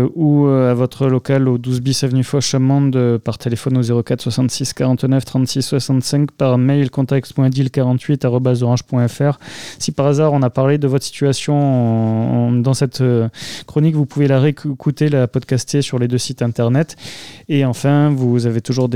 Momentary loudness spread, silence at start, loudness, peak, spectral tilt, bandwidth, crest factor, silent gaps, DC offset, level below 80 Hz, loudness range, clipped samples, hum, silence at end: 5 LU; 0 s; -16 LUFS; -2 dBFS; -6.5 dB/octave; 14.5 kHz; 12 dB; none; 0.5%; -54 dBFS; 2 LU; under 0.1%; none; 0 s